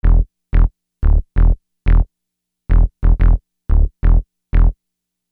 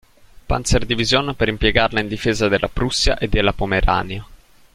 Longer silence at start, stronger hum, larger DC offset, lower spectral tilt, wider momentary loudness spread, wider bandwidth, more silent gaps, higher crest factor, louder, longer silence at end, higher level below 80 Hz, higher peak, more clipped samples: second, 0.05 s vs 0.5 s; neither; neither; first, -11 dB/octave vs -4 dB/octave; about the same, 5 LU vs 5 LU; second, 2.9 kHz vs 14 kHz; neither; second, 12 dB vs 18 dB; about the same, -19 LUFS vs -19 LUFS; first, 0.6 s vs 0.4 s; first, -14 dBFS vs -28 dBFS; about the same, -2 dBFS vs -2 dBFS; neither